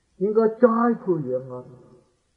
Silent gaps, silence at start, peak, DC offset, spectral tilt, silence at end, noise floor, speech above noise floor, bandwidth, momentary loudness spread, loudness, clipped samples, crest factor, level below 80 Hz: none; 0.2 s; -2 dBFS; under 0.1%; -10.5 dB/octave; 0.6 s; -56 dBFS; 35 dB; 4.6 kHz; 16 LU; -22 LUFS; under 0.1%; 20 dB; -68 dBFS